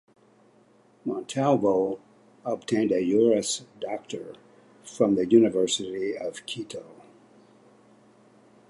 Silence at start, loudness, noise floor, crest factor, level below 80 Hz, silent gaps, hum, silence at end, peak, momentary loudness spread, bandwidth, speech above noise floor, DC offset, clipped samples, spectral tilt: 1.05 s; -25 LUFS; -59 dBFS; 20 dB; -70 dBFS; none; none; 1.8 s; -6 dBFS; 18 LU; 11.5 kHz; 34 dB; under 0.1%; under 0.1%; -5 dB/octave